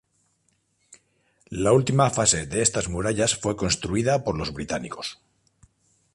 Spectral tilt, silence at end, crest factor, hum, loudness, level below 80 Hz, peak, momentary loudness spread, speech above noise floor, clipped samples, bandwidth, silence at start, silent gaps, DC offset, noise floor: -4 dB/octave; 1 s; 20 dB; none; -23 LUFS; -46 dBFS; -4 dBFS; 12 LU; 46 dB; under 0.1%; 11.5 kHz; 0.9 s; none; under 0.1%; -69 dBFS